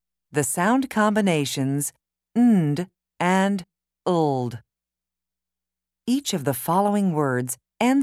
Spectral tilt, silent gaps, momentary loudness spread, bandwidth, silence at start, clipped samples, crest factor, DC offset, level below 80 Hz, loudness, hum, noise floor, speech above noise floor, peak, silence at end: -5.5 dB/octave; none; 10 LU; 16 kHz; 0.35 s; under 0.1%; 16 dB; under 0.1%; -66 dBFS; -23 LUFS; none; -88 dBFS; 67 dB; -6 dBFS; 0 s